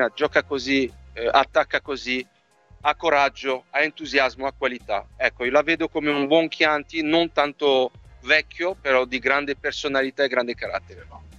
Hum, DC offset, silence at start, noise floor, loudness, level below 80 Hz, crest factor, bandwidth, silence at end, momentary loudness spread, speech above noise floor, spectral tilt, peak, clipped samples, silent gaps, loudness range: none; under 0.1%; 0 s; -53 dBFS; -22 LUFS; -52 dBFS; 20 dB; 8.2 kHz; 0.05 s; 8 LU; 30 dB; -4 dB/octave; -2 dBFS; under 0.1%; none; 2 LU